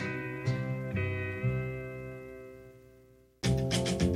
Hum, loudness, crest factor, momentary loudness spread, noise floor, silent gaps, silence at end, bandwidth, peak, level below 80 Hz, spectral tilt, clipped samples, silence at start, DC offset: 60 Hz at -55 dBFS; -33 LUFS; 18 dB; 18 LU; -60 dBFS; none; 0 s; 14 kHz; -14 dBFS; -48 dBFS; -5.5 dB/octave; under 0.1%; 0 s; under 0.1%